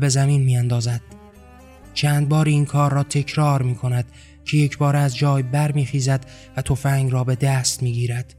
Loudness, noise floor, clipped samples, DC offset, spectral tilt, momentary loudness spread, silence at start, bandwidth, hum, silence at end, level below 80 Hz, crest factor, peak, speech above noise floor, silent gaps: -20 LUFS; -44 dBFS; under 0.1%; under 0.1%; -5.5 dB/octave; 8 LU; 0 s; 14 kHz; none; 0.15 s; -46 dBFS; 14 dB; -6 dBFS; 25 dB; none